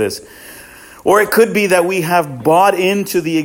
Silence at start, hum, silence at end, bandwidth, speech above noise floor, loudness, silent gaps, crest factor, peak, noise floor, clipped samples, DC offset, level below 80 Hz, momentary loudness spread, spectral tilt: 0 s; none; 0 s; 17 kHz; 24 dB; -13 LUFS; none; 14 dB; 0 dBFS; -38 dBFS; under 0.1%; under 0.1%; -54 dBFS; 12 LU; -4.5 dB/octave